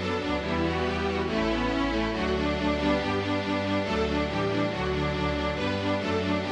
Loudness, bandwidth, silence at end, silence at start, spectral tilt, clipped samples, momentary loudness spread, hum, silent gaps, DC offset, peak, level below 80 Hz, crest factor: -27 LUFS; 10.5 kHz; 0 s; 0 s; -6 dB/octave; under 0.1%; 2 LU; none; none; under 0.1%; -14 dBFS; -40 dBFS; 14 dB